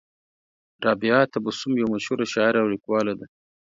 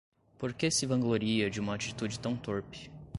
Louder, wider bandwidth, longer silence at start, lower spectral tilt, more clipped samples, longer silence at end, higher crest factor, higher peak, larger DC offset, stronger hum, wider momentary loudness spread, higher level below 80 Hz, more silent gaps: first, -23 LUFS vs -32 LUFS; second, 7.8 kHz vs 11.5 kHz; first, 0.8 s vs 0.4 s; about the same, -5.5 dB/octave vs -4.5 dB/octave; neither; first, 0.35 s vs 0 s; about the same, 20 dB vs 18 dB; first, -4 dBFS vs -16 dBFS; neither; neither; second, 7 LU vs 10 LU; second, -66 dBFS vs -60 dBFS; neither